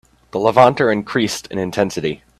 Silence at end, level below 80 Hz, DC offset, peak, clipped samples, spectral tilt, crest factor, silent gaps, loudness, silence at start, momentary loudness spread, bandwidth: 0.25 s; -52 dBFS; under 0.1%; 0 dBFS; under 0.1%; -5 dB/octave; 18 dB; none; -17 LUFS; 0.35 s; 11 LU; 14.5 kHz